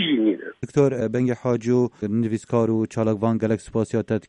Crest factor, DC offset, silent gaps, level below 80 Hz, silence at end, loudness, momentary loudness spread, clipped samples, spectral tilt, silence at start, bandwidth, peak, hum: 16 dB; under 0.1%; none; -56 dBFS; 0.1 s; -23 LUFS; 4 LU; under 0.1%; -7 dB/octave; 0 s; 10.5 kHz; -6 dBFS; none